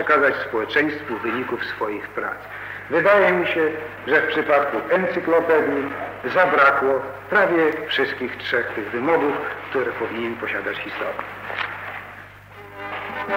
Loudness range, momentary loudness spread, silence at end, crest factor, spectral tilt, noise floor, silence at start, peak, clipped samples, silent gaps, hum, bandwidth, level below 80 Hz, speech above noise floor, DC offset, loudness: 8 LU; 15 LU; 0 s; 18 dB; -6 dB/octave; -41 dBFS; 0 s; -4 dBFS; under 0.1%; none; 50 Hz at -50 dBFS; 16 kHz; -58 dBFS; 21 dB; under 0.1%; -21 LUFS